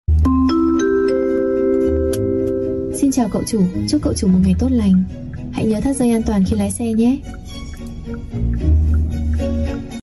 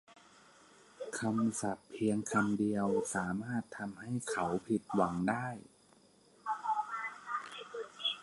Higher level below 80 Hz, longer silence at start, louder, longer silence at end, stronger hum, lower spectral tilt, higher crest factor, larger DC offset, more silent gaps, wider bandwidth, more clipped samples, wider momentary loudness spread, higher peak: first, -24 dBFS vs -68 dBFS; about the same, 0.1 s vs 0.1 s; first, -17 LUFS vs -36 LUFS; about the same, 0 s vs 0 s; neither; first, -7 dB/octave vs -5 dB/octave; second, 10 dB vs 20 dB; neither; neither; about the same, 12 kHz vs 11.5 kHz; neither; about the same, 12 LU vs 11 LU; first, -6 dBFS vs -16 dBFS